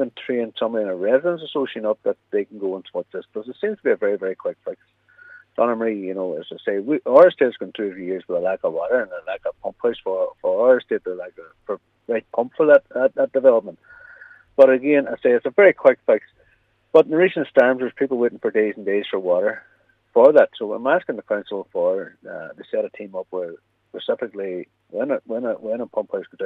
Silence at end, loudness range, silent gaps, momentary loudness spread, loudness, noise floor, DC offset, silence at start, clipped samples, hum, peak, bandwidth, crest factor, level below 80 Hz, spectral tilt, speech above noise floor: 0 s; 9 LU; none; 16 LU; -20 LUFS; -61 dBFS; under 0.1%; 0 s; under 0.1%; none; -2 dBFS; 4.1 kHz; 18 dB; -70 dBFS; -7.5 dB/octave; 41 dB